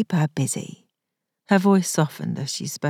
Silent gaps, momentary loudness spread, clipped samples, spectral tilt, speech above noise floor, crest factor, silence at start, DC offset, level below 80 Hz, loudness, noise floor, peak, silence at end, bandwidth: none; 11 LU; under 0.1%; -5.5 dB/octave; 61 dB; 20 dB; 0 s; under 0.1%; -78 dBFS; -22 LUFS; -82 dBFS; -4 dBFS; 0 s; 16 kHz